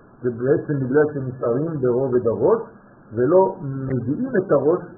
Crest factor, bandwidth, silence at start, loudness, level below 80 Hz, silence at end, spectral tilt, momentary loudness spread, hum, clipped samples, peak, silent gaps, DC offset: 16 dB; 2.1 kHz; 0.2 s; -21 LUFS; -56 dBFS; 0 s; -5.5 dB/octave; 8 LU; none; under 0.1%; -4 dBFS; none; under 0.1%